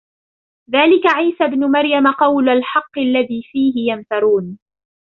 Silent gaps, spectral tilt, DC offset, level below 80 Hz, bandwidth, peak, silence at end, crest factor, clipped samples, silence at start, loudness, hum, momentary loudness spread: none; -6.5 dB/octave; under 0.1%; -60 dBFS; 6 kHz; -2 dBFS; 0.5 s; 14 dB; under 0.1%; 0.7 s; -15 LUFS; none; 7 LU